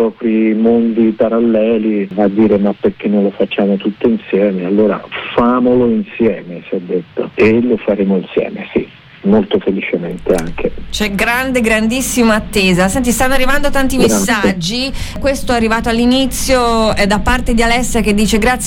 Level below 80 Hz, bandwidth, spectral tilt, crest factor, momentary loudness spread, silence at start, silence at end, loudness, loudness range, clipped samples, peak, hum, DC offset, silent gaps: -26 dBFS; 17.5 kHz; -4.5 dB/octave; 12 dB; 7 LU; 0 s; 0 s; -13 LUFS; 3 LU; under 0.1%; 0 dBFS; none; under 0.1%; none